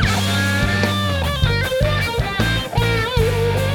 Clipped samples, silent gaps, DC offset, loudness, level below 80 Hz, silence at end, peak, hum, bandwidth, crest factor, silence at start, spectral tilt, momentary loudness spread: under 0.1%; none; under 0.1%; -18 LUFS; -28 dBFS; 0 s; -2 dBFS; none; 18.5 kHz; 16 dB; 0 s; -5 dB/octave; 2 LU